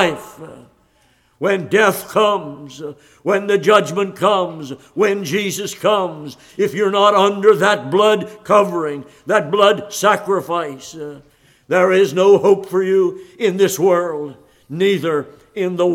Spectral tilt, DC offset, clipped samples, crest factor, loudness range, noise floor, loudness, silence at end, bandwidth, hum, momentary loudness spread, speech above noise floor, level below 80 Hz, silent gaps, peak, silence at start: -4.5 dB/octave; under 0.1%; under 0.1%; 16 dB; 3 LU; -57 dBFS; -16 LUFS; 0 s; 16.5 kHz; none; 18 LU; 41 dB; -62 dBFS; none; 0 dBFS; 0 s